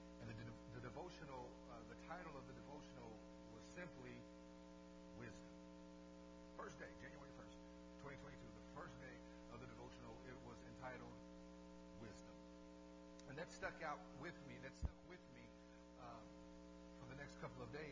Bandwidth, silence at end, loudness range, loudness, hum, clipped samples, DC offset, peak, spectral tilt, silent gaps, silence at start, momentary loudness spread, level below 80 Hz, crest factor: 8 kHz; 0 s; 4 LU; -57 LUFS; 60 Hz at -65 dBFS; under 0.1%; under 0.1%; -30 dBFS; -5.5 dB/octave; none; 0 s; 8 LU; -66 dBFS; 26 dB